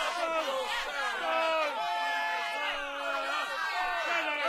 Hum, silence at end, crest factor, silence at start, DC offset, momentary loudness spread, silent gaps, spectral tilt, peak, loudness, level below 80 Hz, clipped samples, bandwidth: none; 0 s; 16 dB; 0 s; under 0.1%; 3 LU; none; 0 dB/octave; -16 dBFS; -31 LUFS; -62 dBFS; under 0.1%; 16 kHz